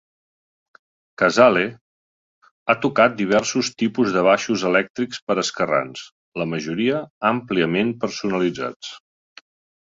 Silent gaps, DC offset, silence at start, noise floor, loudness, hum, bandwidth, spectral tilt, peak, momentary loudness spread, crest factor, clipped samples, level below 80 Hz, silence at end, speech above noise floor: 1.81-2.42 s, 2.51-2.66 s, 4.90-4.94 s, 5.22-5.27 s, 6.12-6.32 s, 7.10-7.21 s, 8.76-8.80 s; under 0.1%; 1.2 s; under -90 dBFS; -20 LUFS; none; 8 kHz; -4.5 dB/octave; -2 dBFS; 13 LU; 20 dB; under 0.1%; -60 dBFS; 0.8 s; over 70 dB